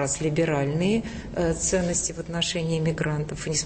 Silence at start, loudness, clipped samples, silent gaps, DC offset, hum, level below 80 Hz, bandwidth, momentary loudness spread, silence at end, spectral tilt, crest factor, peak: 0 s; -25 LUFS; under 0.1%; none; under 0.1%; none; -42 dBFS; 8.8 kHz; 4 LU; 0 s; -4 dB/octave; 14 dB; -12 dBFS